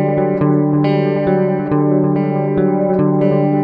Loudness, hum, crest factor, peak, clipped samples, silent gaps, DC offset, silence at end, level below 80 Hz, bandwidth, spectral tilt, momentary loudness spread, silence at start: -15 LUFS; none; 12 dB; -2 dBFS; under 0.1%; none; under 0.1%; 0 s; -48 dBFS; 5 kHz; -11.5 dB/octave; 2 LU; 0 s